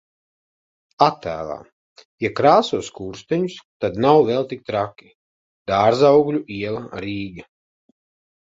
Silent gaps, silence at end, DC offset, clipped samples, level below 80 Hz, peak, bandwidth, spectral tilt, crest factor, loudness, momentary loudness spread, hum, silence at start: 1.72-1.96 s, 2.05-2.18 s, 3.65-3.80 s, 5.15-5.66 s; 1.15 s; under 0.1%; under 0.1%; -54 dBFS; 0 dBFS; 7.8 kHz; -6 dB/octave; 20 dB; -20 LUFS; 15 LU; none; 1 s